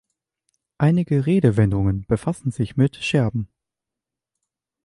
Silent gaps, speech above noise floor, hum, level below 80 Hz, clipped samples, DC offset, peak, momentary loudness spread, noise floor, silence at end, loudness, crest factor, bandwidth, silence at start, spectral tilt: none; 67 dB; none; -44 dBFS; under 0.1%; under 0.1%; -4 dBFS; 8 LU; -86 dBFS; 1.4 s; -21 LUFS; 18 dB; 11.5 kHz; 0.8 s; -8 dB/octave